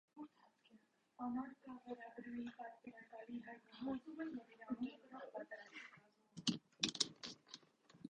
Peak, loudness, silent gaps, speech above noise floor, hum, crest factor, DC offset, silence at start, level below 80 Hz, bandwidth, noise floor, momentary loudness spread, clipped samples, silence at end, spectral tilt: -18 dBFS; -48 LUFS; none; 23 dB; none; 32 dB; under 0.1%; 0.15 s; -84 dBFS; 9 kHz; -72 dBFS; 17 LU; under 0.1%; 0 s; -3 dB/octave